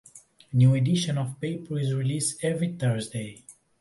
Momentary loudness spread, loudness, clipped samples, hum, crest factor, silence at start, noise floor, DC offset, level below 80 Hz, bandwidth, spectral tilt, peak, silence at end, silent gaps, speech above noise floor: 12 LU; -26 LUFS; under 0.1%; none; 16 dB; 0.15 s; -50 dBFS; under 0.1%; -60 dBFS; 11.5 kHz; -6 dB/octave; -10 dBFS; 0.3 s; none; 25 dB